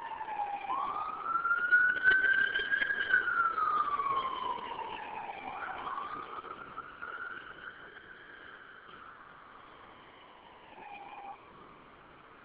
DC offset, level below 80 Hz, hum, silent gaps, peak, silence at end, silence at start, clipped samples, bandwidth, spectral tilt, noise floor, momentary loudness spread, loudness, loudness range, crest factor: under 0.1%; -68 dBFS; none; none; -16 dBFS; 0 s; 0 s; under 0.1%; 4 kHz; 1.5 dB/octave; -55 dBFS; 25 LU; -31 LUFS; 23 LU; 20 dB